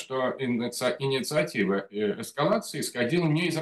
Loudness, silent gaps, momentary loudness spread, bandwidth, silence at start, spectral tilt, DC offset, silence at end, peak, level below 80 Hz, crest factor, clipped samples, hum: -27 LUFS; none; 5 LU; 12.5 kHz; 0 s; -5 dB/octave; under 0.1%; 0 s; -12 dBFS; -70 dBFS; 14 dB; under 0.1%; none